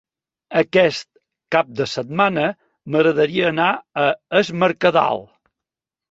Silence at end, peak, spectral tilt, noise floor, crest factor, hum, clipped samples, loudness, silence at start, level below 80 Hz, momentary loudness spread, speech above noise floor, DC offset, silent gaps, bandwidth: 0.85 s; -2 dBFS; -5.5 dB/octave; -87 dBFS; 18 dB; none; under 0.1%; -19 LUFS; 0.5 s; -60 dBFS; 7 LU; 69 dB; under 0.1%; none; 8 kHz